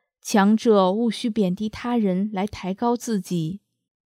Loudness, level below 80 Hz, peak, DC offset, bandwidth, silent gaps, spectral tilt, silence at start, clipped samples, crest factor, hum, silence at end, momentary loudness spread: -22 LUFS; -58 dBFS; -6 dBFS; under 0.1%; 15 kHz; none; -6 dB/octave; 0.25 s; under 0.1%; 18 dB; none; 0.6 s; 10 LU